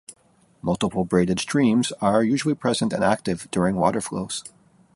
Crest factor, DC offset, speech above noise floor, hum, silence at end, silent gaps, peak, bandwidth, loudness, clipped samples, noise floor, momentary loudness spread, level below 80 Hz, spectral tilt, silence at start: 18 dB; under 0.1%; 38 dB; none; 0.45 s; none; -6 dBFS; 11.5 kHz; -23 LUFS; under 0.1%; -60 dBFS; 8 LU; -52 dBFS; -5.5 dB/octave; 0.1 s